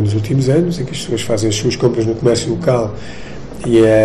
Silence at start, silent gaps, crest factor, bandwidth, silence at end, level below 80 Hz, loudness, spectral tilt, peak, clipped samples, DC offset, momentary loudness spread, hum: 0 s; none; 14 dB; 13 kHz; 0 s; -38 dBFS; -16 LUFS; -6 dB/octave; -2 dBFS; under 0.1%; under 0.1%; 14 LU; none